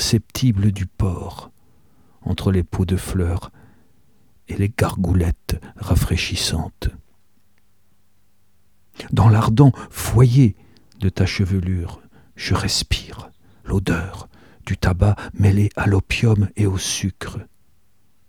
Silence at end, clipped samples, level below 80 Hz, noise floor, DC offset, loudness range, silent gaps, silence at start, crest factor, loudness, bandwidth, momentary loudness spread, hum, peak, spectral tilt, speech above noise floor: 0.85 s; under 0.1%; -34 dBFS; -64 dBFS; 0.3%; 7 LU; none; 0 s; 20 dB; -20 LUFS; 17.5 kHz; 17 LU; none; -2 dBFS; -6 dB/octave; 46 dB